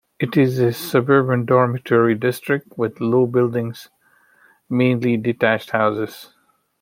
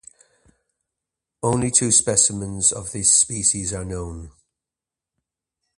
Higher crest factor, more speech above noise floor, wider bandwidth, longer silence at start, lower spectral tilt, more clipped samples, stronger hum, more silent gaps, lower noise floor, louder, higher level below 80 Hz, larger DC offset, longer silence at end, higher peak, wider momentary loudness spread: about the same, 18 dB vs 22 dB; second, 38 dB vs 68 dB; first, 16.5 kHz vs 11.5 kHz; second, 0.2 s vs 1.45 s; first, -7 dB/octave vs -3 dB/octave; neither; neither; neither; second, -56 dBFS vs -88 dBFS; about the same, -19 LUFS vs -18 LUFS; second, -62 dBFS vs -46 dBFS; neither; second, 0.55 s vs 1.5 s; about the same, -2 dBFS vs 0 dBFS; second, 9 LU vs 15 LU